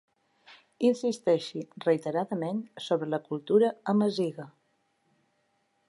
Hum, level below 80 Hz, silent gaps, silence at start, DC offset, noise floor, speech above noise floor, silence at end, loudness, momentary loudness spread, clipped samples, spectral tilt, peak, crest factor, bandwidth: none; -82 dBFS; none; 0.5 s; under 0.1%; -73 dBFS; 45 dB; 1.4 s; -29 LUFS; 9 LU; under 0.1%; -6.5 dB/octave; -12 dBFS; 18 dB; 11.5 kHz